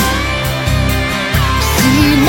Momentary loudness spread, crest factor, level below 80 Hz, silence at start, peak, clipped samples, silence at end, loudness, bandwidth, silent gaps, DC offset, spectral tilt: 5 LU; 12 dB; -20 dBFS; 0 s; 0 dBFS; under 0.1%; 0 s; -13 LUFS; 17 kHz; none; under 0.1%; -4.5 dB/octave